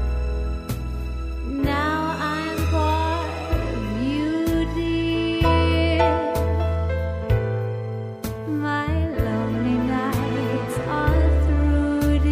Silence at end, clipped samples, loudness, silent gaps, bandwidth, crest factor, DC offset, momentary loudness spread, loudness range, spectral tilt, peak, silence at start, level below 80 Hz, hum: 0 s; under 0.1%; -23 LUFS; none; 15.5 kHz; 16 dB; under 0.1%; 9 LU; 3 LU; -7 dB/octave; -6 dBFS; 0 s; -26 dBFS; none